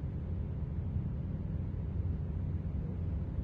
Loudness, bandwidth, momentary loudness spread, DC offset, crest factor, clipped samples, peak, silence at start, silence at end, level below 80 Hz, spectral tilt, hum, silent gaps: -38 LUFS; 3.6 kHz; 2 LU; under 0.1%; 12 dB; under 0.1%; -24 dBFS; 0 s; 0 s; -40 dBFS; -11.5 dB/octave; none; none